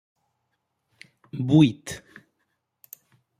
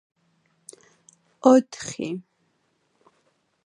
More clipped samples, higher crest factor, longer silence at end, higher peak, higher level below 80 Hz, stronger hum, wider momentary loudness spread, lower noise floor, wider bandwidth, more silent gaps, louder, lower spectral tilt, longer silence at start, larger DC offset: neither; about the same, 22 dB vs 24 dB; about the same, 1.4 s vs 1.45 s; second, -6 dBFS vs -2 dBFS; first, -62 dBFS vs -72 dBFS; neither; first, 21 LU vs 16 LU; first, -77 dBFS vs -70 dBFS; first, 14.5 kHz vs 11.5 kHz; neither; about the same, -21 LUFS vs -22 LUFS; first, -7 dB/octave vs -5 dB/octave; about the same, 1.35 s vs 1.45 s; neither